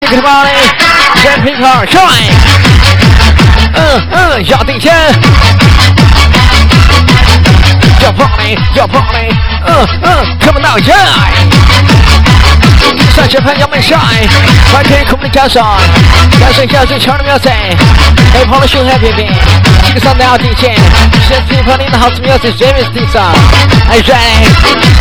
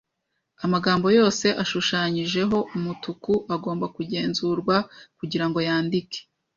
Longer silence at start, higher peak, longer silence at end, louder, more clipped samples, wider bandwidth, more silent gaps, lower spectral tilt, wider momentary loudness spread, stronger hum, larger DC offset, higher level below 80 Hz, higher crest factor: second, 0 s vs 0.6 s; first, 0 dBFS vs -6 dBFS; second, 0 s vs 0.35 s; first, -5 LUFS vs -24 LUFS; first, 20% vs under 0.1%; first, over 20 kHz vs 7.6 kHz; neither; about the same, -5 dB/octave vs -5 dB/octave; second, 4 LU vs 12 LU; neither; first, 6% vs under 0.1%; first, -10 dBFS vs -60 dBFS; second, 4 dB vs 18 dB